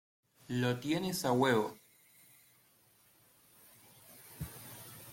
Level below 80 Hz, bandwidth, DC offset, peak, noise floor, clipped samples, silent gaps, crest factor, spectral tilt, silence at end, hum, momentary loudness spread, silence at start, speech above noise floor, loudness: -66 dBFS; 16.5 kHz; under 0.1%; -18 dBFS; -68 dBFS; under 0.1%; none; 20 dB; -5 dB/octave; 0 s; none; 26 LU; 0.5 s; 35 dB; -34 LUFS